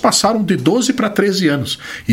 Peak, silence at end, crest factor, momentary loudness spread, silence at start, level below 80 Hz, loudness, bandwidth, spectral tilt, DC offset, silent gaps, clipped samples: 0 dBFS; 0 s; 14 dB; 7 LU; 0 s; -50 dBFS; -15 LUFS; 16.5 kHz; -4 dB/octave; under 0.1%; none; under 0.1%